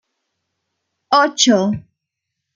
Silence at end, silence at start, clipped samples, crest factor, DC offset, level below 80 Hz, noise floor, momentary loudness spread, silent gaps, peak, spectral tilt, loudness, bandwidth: 0.75 s; 1.1 s; under 0.1%; 20 dB; under 0.1%; -60 dBFS; -79 dBFS; 10 LU; none; 0 dBFS; -3 dB/octave; -15 LUFS; 9.6 kHz